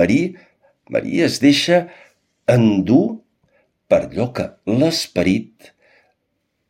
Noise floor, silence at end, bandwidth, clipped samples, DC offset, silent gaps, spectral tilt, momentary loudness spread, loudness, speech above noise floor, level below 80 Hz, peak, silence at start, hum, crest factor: -71 dBFS; 1.25 s; 15.5 kHz; under 0.1%; under 0.1%; none; -5.5 dB/octave; 10 LU; -17 LUFS; 55 dB; -52 dBFS; 0 dBFS; 0 s; none; 18 dB